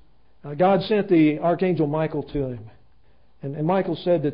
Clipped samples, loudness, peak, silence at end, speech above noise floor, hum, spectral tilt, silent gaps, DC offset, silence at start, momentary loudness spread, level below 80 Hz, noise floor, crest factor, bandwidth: under 0.1%; -22 LUFS; -8 dBFS; 0 s; 39 dB; none; -12 dB/octave; none; 0.3%; 0.45 s; 18 LU; -52 dBFS; -60 dBFS; 16 dB; 5.4 kHz